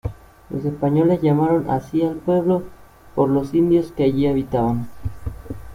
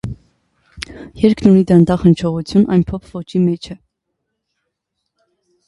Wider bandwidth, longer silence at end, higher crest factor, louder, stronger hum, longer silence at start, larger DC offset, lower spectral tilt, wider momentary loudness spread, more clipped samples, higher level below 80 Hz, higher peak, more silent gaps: first, 15.5 kHz vs 11 kHz; second, 0 s vs 1.95 s; about the same, 14 dB vs 16 dB; second, -20 LUFS vs -14 LUFS; neither; about the same, 0.05 s vs 0.05 s; neither; about the same, -9.5 dB/octave vs -8.5 dB/octave; second, 14 LU vs 20 LU; neither; about the same, -42 dBFS vs -40 dBFS; second, -6 dBFS vs 0 dBFS; neither